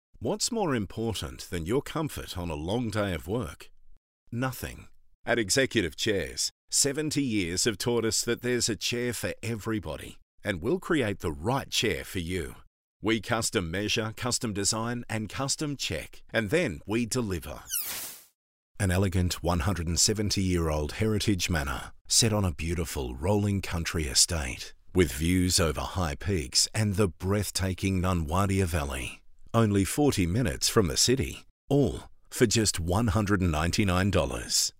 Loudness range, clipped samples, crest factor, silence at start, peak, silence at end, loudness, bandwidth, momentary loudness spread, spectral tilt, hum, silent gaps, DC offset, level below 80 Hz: 5 LU; under 0.1%; 22 dB; 0.15 s; -8 dBFS; 0.1 s; -28 LUFS; 16 kHz; 10 LU; -4 dB/octave; none; 3.97-4.27 s, 5.15-5.24 s, 6.51-6.68 s, 10.22-10.38 s, 12.67-13.00 s, 18.35-18.75 s, 22.01-22.05 s, 31.50-31.68 s; under 0.1%; -44 dBFS